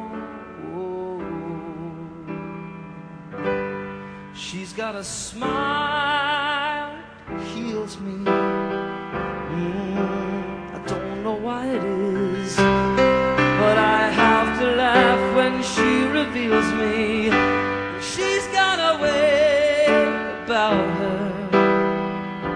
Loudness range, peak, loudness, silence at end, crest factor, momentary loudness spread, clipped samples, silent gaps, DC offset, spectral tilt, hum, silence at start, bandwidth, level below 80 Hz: 13 LU; -2 dBFS; -21 LUFS; 0 s; 20 dB; 17 LU; under 0.1%; none; under 0.1%; -5 dB/octave; none; 0 s; 10.5 kHz; -46 dBFS